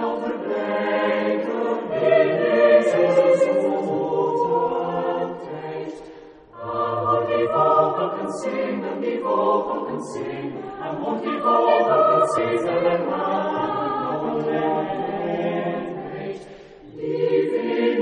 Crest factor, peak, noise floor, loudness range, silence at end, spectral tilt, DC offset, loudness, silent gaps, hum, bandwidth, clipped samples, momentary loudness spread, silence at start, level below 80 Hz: 18 dB; -4 dBFS; -43 dBFS; 6 LU; 0 s; -6.5 dB/octave; under 0.1%; -22 LUFS; none; none; 10 kHz; under 0.1%; 14 LU; 0 s; -62 dBFS